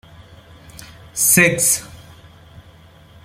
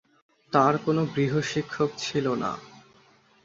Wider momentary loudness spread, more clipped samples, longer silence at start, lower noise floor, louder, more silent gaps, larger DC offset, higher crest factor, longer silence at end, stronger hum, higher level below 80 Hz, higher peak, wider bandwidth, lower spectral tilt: about the same, 10 LU vs 8 LU; neither; first, 0.75 s vs 0.5 s; second, -46 dBFS vs -59 dBFS; first, -14 LUFS vs -26 LUFS; neither; neither; about the same, 22 dB vs 22 dB; first, 1.3 s vs 0.65 s; neither; first, -52 dBFS vs -64 dBFS; first, 0 dBFS vs -6 dBFS; first, 16.5 kHz vs 7.8 kHz; second, -2.5 dB/octave vs -6 dB/octave